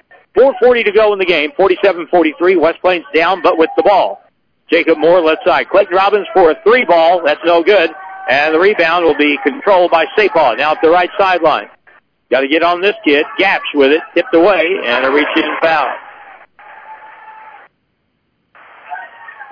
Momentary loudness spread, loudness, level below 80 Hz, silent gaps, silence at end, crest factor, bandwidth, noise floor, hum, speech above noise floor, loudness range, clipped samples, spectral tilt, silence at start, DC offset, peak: 6 LU; -11 LUFS; -50 dBFS; none; 0.1 s; 12 dB; 5.4 kHz; -64 dBFS; none; 53 dB; 3 LU; under 0.1%; -5.5 dB/octave; 0.35 s; under 0.1%; -2 dBFS